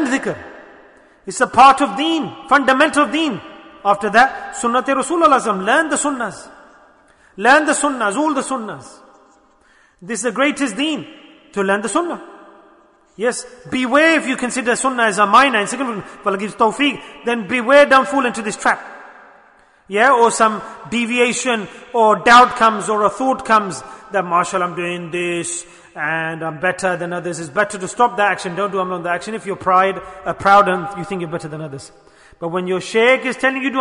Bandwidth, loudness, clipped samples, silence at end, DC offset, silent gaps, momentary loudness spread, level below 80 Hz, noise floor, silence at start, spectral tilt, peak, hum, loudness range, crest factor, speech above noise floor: 11 kHz; -16 LUFS; under 0.1%; 0 s; under 0.1%; none; 14 LU; -56 dBFS; -53 dBFS; 0 s; -3.5 dB/octave; 0 dBFS; none; 7 LU; 18 dB; 37 dB